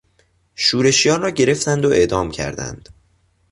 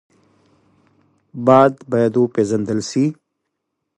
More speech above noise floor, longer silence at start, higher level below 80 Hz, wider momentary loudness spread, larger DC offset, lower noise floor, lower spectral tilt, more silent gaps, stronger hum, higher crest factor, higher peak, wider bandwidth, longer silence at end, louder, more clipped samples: second, 43 dB vs 61 dB; second, 0.6 s vs 1.35 s; first, -44 dBFS vs -60 dBFS; first, 12 LU vs 9 LU; neither; second, -60 dBFS vs -76 dBFS; second, -3.5 dB/octave vs -6.5 dB/octave; neither; neither; about the same, 16 dB vs 20 dB; about the same, -2 dBFS vs 0 dBFS; about the same, 11.5 kHz vs 11 kHz; about the same, 0.75 s vs 0.85 s; about the same, -16 LUFS vs -17 LUFS; neither